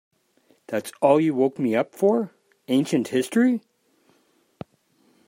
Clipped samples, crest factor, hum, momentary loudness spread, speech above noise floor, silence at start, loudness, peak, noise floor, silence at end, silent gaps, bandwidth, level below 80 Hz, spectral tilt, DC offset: under 0.1%; 20 dB; none; 21 LU; 43 dB; 0.7 s; -22 LUFS; -4 dBFS; -64 dBFS; 1.7 s; none; 16 kHz; -72 dBFS; -6 dB/octave; under 0.1%